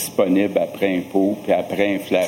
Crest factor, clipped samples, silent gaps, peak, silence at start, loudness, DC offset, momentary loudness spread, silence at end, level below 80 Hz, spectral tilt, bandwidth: 16 dB; under 0.1%; none; -4 dBFS; 0 s; -20 LUFS; under 0.1%; 3 LU; 0 s; -62 dBFS; -5 dB/octave; 17 kHz